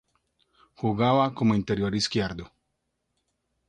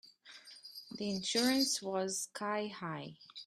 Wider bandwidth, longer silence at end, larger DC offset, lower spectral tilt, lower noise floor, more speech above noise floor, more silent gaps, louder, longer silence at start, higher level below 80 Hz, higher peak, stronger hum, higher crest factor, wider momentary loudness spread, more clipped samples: second, 10 kHz vs 15.5 kHz; first, 1.25 s vs 0 s; neither; first, -6 dB/octave vs -3 dB/octave; first, -78 dBFS vs -57 dBFS; first, 54 dB vs 21 dB; neither; first, -25 LUFS vs -35 LUFS; first, 0.8 s vs 0.05 s; first, -54 dBFS vs -78 dBFS; first, -10 dBFS vs -18 dBFS; neither; about the same, 18 dB vs 20 dB; second, 9 LU vs 21 LU; neither